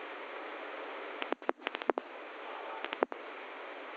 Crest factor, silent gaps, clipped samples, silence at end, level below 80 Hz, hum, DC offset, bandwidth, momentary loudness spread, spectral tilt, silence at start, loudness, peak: 30 dB; none; under 0.1%; 0 s; under -90 dBFS; none; under 0.1%; 7.6 kHz; 9 LU; -3.5 dB/octave; 0 s; -40 LUFS; -10 dBFS